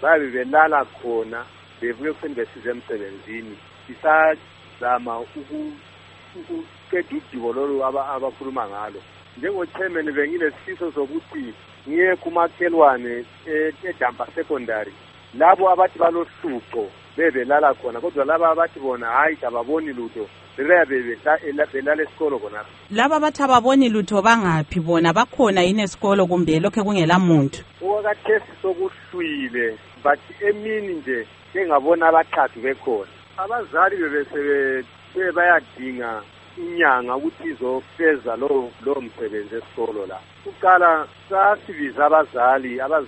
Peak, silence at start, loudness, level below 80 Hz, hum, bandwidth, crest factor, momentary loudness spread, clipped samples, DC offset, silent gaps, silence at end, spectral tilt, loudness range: 0 dBFS; 0 s; -20 LUFS; -58 dBFS; none; 8.4 kHz; 20 dB; 15 LU; under 0.1%; under 0.1%; none; 0 s; -6 dB/octave; 8 LU